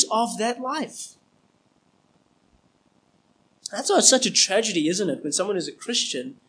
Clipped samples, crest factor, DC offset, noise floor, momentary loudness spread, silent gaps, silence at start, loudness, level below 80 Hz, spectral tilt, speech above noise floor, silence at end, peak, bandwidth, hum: under 0.1%; 24 dB; under 0.1%; -64 dBFS; 18 LU; none; 0 s; -22 LUFS; -78 dBFS; -1.5 dB/octave; 41 dB; 0.15 s; -2 dBFS; 10.5 kHz; none